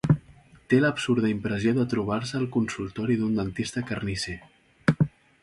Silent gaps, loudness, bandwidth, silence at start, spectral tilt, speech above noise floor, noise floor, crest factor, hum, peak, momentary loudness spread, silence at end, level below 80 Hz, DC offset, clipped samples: none; -26 LUFS; 11.5 kHz; 0.05 s; -6.5 dB/octave; 28 dB; -53 dBFS; 20 dB; none; -6 dBFS; 7 LU; 0.35 s; -52 dBFS; under 0.1%; under 0.1%